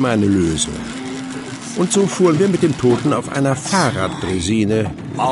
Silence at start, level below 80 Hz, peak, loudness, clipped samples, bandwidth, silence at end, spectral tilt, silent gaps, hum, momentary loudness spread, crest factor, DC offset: 0 s; -40 dBFS; -2 dBFS; -18 LUFS; under 0.1%; 11.5 kHz; 0 s; -5 dB/octave; none; none; 12 LU; 14 dB; under 0.1%